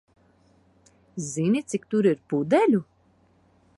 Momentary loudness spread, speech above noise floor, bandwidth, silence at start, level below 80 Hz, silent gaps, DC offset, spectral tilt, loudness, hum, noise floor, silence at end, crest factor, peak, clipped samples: 12 LU; 39 dB; 11.5 kHz; 1.15 s; -68 dBFS; none; under 0.1%; -6.5 dB/octave; -24 LUFS; none; -62 dBFS; 0.95 s; 18 dB; -8 dBFS; under 0.1%